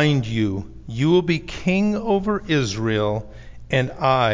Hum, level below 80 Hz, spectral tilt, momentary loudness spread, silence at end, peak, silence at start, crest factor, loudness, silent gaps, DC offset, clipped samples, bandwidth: none; -42 dBFS; -6.5 dB/octave; 7 LU; 0 s; -6 dBFS; 0 s; 16 dB; -21 LUFS; none; under 0.1%; under 0.1%; 7.6 kHz